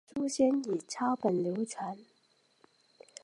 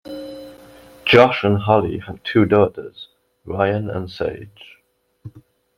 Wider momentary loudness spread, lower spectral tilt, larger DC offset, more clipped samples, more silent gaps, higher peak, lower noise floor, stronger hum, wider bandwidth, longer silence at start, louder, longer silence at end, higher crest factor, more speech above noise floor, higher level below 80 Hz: second, 13 LU vs 23 LU; second, -5.5 dB/octave vs -7.5 dB/octave; neither; neither; neither; second, -16 dBFS vs -2 dBFS; first, -70 dBFS vs -63 dBFS; neither; second, 11.5 kHz vs 14.5 kHz; about the same, 0.15 s vs 0.05 s; second, -32 LUFS vs -18 LUFS; first, 1.2 s vs 0.4 s; about the same, 18 dB vs 18 dB; second, 39 dB vs 46 dB; second, -78 dBFS vs -52 dBFS